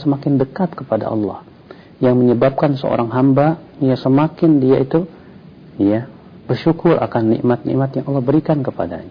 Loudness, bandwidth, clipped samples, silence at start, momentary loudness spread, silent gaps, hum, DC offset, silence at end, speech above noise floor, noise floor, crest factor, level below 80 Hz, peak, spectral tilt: -16 LUFS; 5.2 kHz; under 0.1%; 0 s; 9 LU; none; none; under 0.1%; 0 s; 25 dB; -40 dBFS; 12 dB; -50 dBFS; -4 dBFS; -11 dB/octave